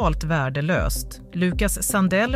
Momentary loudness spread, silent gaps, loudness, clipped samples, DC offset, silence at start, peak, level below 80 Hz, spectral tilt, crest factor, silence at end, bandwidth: 7 LU; none; -23 LUFS; under 0.1%; under 0.1%; 0 s; -8 dBFS; -30 dBFS; -5 dB/octave; 12 dB; 0 s; 16 kHz